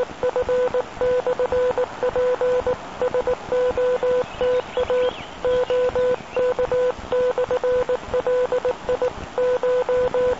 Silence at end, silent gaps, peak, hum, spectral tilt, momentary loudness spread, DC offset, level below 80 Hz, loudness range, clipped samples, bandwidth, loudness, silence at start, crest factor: 0 s; none; -10 dBFS; none; -5 dB/octave; 4 LU; 0.4%; -44 dBFS; 1 LU; under 0.1%; 8 kHz; -22 LUFS; 0 s; 10 dB